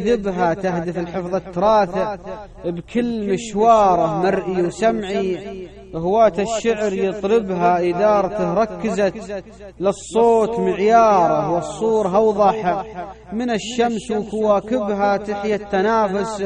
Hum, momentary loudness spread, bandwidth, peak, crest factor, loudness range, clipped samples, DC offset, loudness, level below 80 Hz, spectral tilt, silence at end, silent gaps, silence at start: none; 11 LU; 10 kHz; -2 dBFS; 16 dB; 4 LU; under 0.1%; under 0.1%; -19 LUFS; -46 dBFS; -6 dB/octave; 0 s; none; 0 s